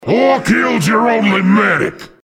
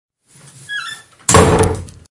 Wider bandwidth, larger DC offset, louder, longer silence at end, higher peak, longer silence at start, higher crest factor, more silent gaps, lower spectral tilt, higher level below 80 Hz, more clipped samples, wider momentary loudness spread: first, 15.5 kHz vs 12 kHz; neither; about the same, -12 LUFS vs -14 LUFS; about the same, 0.2 s vs 0.2 s; about the same, 0 dBFS vs 0 dBFS; second, 0 s vs 0.7 s; about the same, 12 dB vs 16 dB; neither; first, -5.5 dB/octave vs -4 dB/octave; second, -48 dBFS vs -34 dBFS; neither; second, 3 LU vs 17 LU